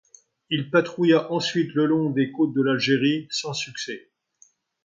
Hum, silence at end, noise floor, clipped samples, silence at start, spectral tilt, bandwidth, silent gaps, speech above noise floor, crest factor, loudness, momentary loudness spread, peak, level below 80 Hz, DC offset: none; 0.85 s; -60 dBFS; under 0.1%; 0.5 s; -5 dB/octave; 7.6 kHz; none; 37 dB; 18 dB; -23 LUFS; 9 LU; -6 dBFS; -70 dBFS; under 0.1%